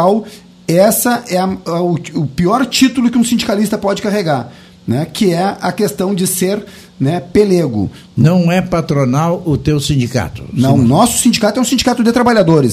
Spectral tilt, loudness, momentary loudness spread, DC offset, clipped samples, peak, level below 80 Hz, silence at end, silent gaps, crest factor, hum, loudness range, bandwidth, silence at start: -5.5 dB/octave; -13 LUFS; 9 LU; under 0.1%; under 0.1%; 0 dBFS; -40 dBFS; 0 s; none; 12 dB; none; 3 LU; 15.5 kHz; 0 s